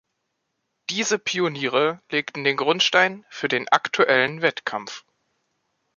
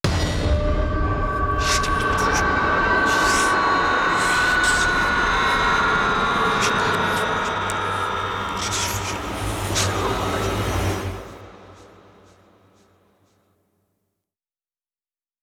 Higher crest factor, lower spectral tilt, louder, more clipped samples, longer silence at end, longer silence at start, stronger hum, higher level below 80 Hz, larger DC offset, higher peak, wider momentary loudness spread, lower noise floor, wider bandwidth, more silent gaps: first, 22 dB vs 16 dB; about the same, -3 dB/octave vs -3.5 dB/octave; about the same, -21 LUFS vs -20 LUFS; neither; second, 1 s vs 3.55 s; first, 0.9 s vs 0.05 s; neither; second, -74 dBFS vs -32 dBFS; neither; first, -2 dBFS vs -6 dBFS; first, 12 LU vs 7 LU; second, -77 dBFS vs under -90 dBFS; second, 7.4 kHz vs 17.5 kHz; neither